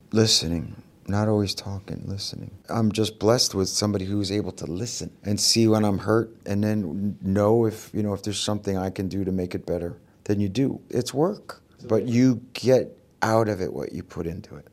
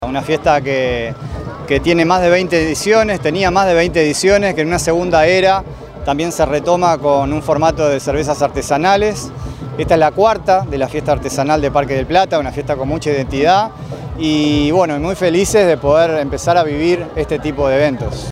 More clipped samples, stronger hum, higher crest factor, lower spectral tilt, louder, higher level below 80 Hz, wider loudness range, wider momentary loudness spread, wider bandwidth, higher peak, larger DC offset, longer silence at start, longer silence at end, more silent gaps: neither; neither; first, 20 dB vs 14 dB; about the same, -5 dB/octave vs -5 dB/octave; second, -24 LUFS vs -14 LUFS; second, -56 dBFS vs -34 dBFS; about the same, 4 LU vs 3 LU; first, 13 LU vs 8 LU; about the same, 15.5 kHz vs 16 kHz; second, -4 dBFS vs 0 dBFS; neither; first, 0.15 s vs 0 s; about the same, 0.1 s vs 0 s; neither